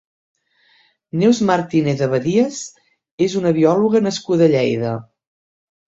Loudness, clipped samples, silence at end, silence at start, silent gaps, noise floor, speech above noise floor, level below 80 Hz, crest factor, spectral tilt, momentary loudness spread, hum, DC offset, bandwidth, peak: -17 LUFS; under 0.1%; 0.9 s; 1.15 s; 3.11-3.18 s; -57 dBFS; 41 dB; -58 dBFS; 16 dB; -6 dB/octave; 11 LU; none; under 0.1%; 8 kHz; -2 dBFS